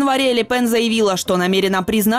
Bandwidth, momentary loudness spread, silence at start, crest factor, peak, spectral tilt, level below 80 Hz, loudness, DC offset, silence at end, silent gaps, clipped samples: 16 kHz; 2 LU; 0 s; 10 dB; -6 dBFS; -4 dB/octave; -48 dBFS; -17 LUFS; under 0.1%; 0 s; none; under 0.1%